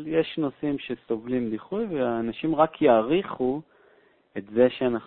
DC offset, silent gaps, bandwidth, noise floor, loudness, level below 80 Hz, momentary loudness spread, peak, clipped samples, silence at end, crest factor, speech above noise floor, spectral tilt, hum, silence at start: under 0.1%; none; 4.4 kHz; -60 dBFS; -25 LUFS; -58 dBFS; 10 LU; -6 dBFS; under 0.1%; 0 s; 20 dB; 35 dB; -10.5 dB/octave; none; 0 s